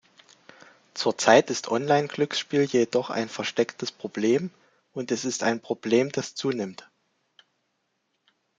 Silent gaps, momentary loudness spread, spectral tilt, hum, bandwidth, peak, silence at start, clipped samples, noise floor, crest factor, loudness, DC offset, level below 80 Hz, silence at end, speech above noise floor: none; 13 LU; -4 dB/octave; none; 9.4 kHz; -2 dBFS; 0.95 s; under 0.1%; -75 dBFS; 24 dB; -25 LUFS; under 0.1%; -72 dBFS; 1.85 s; 51 dB